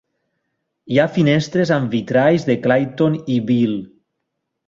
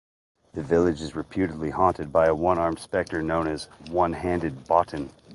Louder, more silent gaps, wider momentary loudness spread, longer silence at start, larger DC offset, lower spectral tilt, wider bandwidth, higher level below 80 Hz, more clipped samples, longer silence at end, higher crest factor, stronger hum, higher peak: first, -17 LUFS vs -25 LUFS; neither; second, 4 LU vs 10 LU; first, 0.85 s vs 0.55 s; neither; about the same, -7 dB/octave vs -7 dB/octave; second, 7.6 kHz vs 11.5 kHz; second, -56 dBFS vs -46 dBFS; neither; first, 0.8 s vs 0 s; about the same, 16 dB vs 20 dB; neither; about the same, -2 dBFS vs -4 dBFS